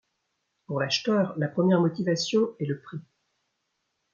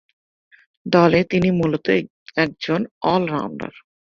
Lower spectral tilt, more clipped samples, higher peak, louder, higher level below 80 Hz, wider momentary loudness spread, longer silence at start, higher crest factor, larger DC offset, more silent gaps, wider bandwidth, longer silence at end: second, -5.5 dB/octave vs -7.5 dB/octave; neither; second, -10 dBFS vs -2 dBFS; second, -26 LUFS vs -20 LUFS; second, -74 dBFS vs -54 dBFS; about the same, 12 LU vs 14 LU; second, 0.7 s vs 0.85 s; about the same, 18 dB vs 18 dB; neither; second, none vs 2.10-2.26 s, 2.91-3.01 s; about the same, 7.2 kHz vs 7 kHz; first, 1.1 s vs 0.45 s